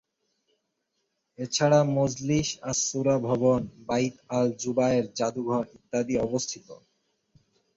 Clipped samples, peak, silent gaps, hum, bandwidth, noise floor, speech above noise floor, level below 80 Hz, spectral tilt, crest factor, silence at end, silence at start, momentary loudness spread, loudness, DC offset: under 0.1%; -8 dBFS; none; none; 8 kHz; -78 dBFS; 52 dB; -58 dBFS; -5 dB/octave; 18 dB; 1 s; 1.4 s; 9 LU; -26 LUFS; under 0.1%